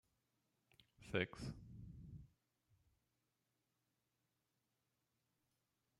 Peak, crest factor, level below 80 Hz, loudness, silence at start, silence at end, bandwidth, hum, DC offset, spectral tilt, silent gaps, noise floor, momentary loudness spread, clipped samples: -26 dBFS; 30 dB; -70 dBFS; -48 LUFS; 0.8 s; 3.75 s; 12 kHz; none; under 0.1%; -6 dB/octave; none; -88 dBFS; 18 LU; under 0.1%